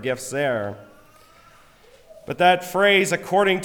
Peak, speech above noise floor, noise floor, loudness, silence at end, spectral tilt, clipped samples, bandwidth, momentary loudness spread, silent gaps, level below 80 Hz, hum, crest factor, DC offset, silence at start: -4 dBFS; 31 dB; -51 dBFS; -20 LUFS; 0 s; -4 dB/octave; under 0.1%; 20 kHz; 16 LU; none; -60 dBFS; none; 18 dB; under 0.1%; 0 s